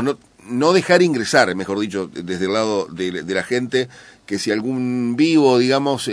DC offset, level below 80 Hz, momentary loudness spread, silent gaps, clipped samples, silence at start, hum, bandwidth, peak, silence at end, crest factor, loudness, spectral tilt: under 0.1%; -62 dBFS; 12 LU; none; under 0.1%; 0 s; none; 11 kHz; 0 dBFS; 0 s; 18 dB; -18 LUFS; -5 dB/octave